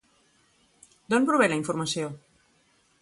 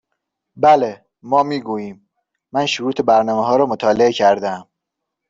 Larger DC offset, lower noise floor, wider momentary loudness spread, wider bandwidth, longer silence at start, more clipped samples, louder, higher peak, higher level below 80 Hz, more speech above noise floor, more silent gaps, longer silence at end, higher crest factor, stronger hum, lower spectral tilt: neither; second, -65 dBFS vs -79 dBFS; about the same, 13 LU vs 12 LU; first, 11.5 kHz vs 7.8 kHz; first, 1.1 s vs 0.55 s; neither; second, -25 LUFS vs -17 LUFS; second, -10 dBFS vs -2 dBFS; second, -68 dBFS vs -60 dBFS; second, 41 dB vs 64 dB; neither; first, 0.85 s vs 0.65 s; about the same, 20 dB vs 16 dB; neither; about the same, -4.5 dB/octave vs -5 dB/octave